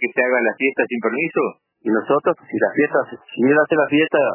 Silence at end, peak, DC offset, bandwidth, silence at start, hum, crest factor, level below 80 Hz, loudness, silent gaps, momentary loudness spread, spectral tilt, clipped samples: 0 s; -2 dBFS; under 0.1%; 3.1 kHz; 0 s; none; 16 dB; -74 dBFS; -19 LUFS; none; 6 LU; -9.5 dB/octave; under 0.1%